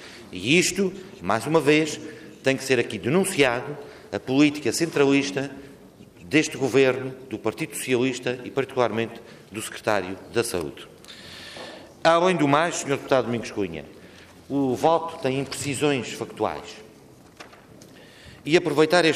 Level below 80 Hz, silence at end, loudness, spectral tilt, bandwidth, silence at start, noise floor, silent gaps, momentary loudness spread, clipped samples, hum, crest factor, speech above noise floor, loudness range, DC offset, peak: -62 dBFS; 0 s; -23 LUFS; -4.5 dB/octave; 15.5 kHz; 0 s; -50 dBFS; none; 18 LU; under 0.1%; none; 18 dB; 26 dB; 5 LU; under 0.1%; -6 dBFS